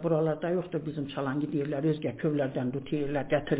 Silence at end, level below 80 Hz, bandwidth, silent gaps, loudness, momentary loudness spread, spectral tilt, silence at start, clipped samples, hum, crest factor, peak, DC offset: 0 s; -60 dBFS; 4 kHz; none; -31 LUFS; 5 LU; -7 dB/octave; 0 s; under 0.1%; none; 16 dB; -14 dBFS; under 0.1%